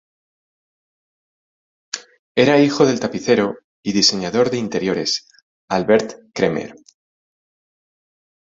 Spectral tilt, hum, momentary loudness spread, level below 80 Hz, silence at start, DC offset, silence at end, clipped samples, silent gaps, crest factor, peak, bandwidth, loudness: -4 dB/octave; none; 15 LU; -58 dBFS; 1.95 s; under 0.1%; 1.85 s; under 0.1%; 2.19-2.35 s, 3.64-3.83 s, 5.42-5.68 s; 20 dB; -2 dBFS; 7.8 kHz; -18 LUFS